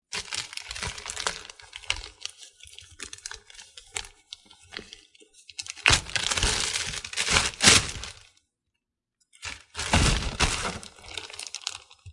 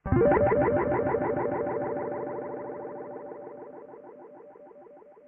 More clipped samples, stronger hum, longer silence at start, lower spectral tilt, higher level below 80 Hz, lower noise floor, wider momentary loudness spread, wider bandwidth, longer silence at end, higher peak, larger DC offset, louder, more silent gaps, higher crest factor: neither; neither; about the same, 0.1 s vs 0.05 s; second, -1.5 dB/octave vs -9 dB/octave; first, -40 dBFS vs -48 dBFS; first, -83 dBFS vs -51 dBFS; second, 22 LU vs 25 LU; first, 11.5 kHz vs 3.3 kHz; second, 0 s vs 0.15 s; first, -2 dBFS vs -10 dBFS; neither; first, -25 LUFS vs -28 LUFS; neither; first, 28 dB vs 20 dB